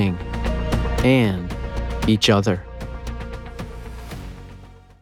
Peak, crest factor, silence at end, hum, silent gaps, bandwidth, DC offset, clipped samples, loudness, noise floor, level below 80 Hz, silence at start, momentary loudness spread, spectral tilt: -2 dBFS; 20 dB; 0.25 s; none; none; 16 kHz; under 0.1%; under 0.1%; -21 LUFS; -43 dBFS; -30 dBFS; 0 s; 19 LU; -6 dB/octave